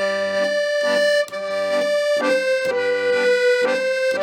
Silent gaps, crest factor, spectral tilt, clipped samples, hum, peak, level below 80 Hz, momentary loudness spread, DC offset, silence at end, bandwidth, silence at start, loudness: none; 12 dB; -2.5 dB/octave; under 0.1%; none; -6 dBFS; -76 dBFS; 4 LU; under 0.1%; 0 s; 15.5 kHz; 0 s; -19 LUFS